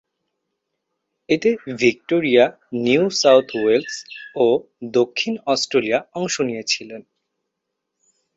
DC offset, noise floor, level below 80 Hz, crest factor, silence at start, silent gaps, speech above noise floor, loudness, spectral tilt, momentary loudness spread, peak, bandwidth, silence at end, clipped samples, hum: under 0.1%; -79 dBFS; -64 dBFS; 20 dB; 1.3 s; none; 60 dB; -19 LUFS; -4 dB/octave; 9 LU; -2 dBFS; 8 kHz; 1.35 s; under 0.1%; none